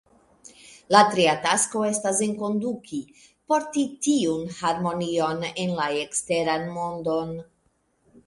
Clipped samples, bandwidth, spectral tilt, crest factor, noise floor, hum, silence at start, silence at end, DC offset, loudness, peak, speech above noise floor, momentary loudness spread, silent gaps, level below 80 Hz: under 0.1%; 11.5 kHz; -3.5 dB/octave; 24 dB; -68 dBFS; none; 0.65 s; 0.85 s; under 0.1%; -24 LUFS; -2 dBFS; 44 dB; 10 LU; none; -64 dBFS